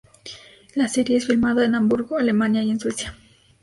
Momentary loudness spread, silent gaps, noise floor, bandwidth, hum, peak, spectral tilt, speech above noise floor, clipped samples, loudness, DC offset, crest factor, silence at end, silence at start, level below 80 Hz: 20 LU; none; -42 dBFS; 11.5 kHz; none; -4 dBFS; -5 dB/octave; 22 dB; under 0.1%; -21 LUFS; under 0.1%; 16 dB; 0.5 s; 0.25 s; -52 dBFS